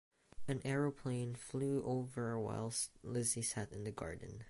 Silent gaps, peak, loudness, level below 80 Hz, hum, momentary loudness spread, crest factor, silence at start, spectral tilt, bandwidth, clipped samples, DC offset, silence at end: none; -24 dBFS; -40 LUFS; -64 dBFS; none; 8 LU; 18 dB; 0.35 s; -5 dB/octave; 12 kHz; under 0.1%; under 0.1%; 0 s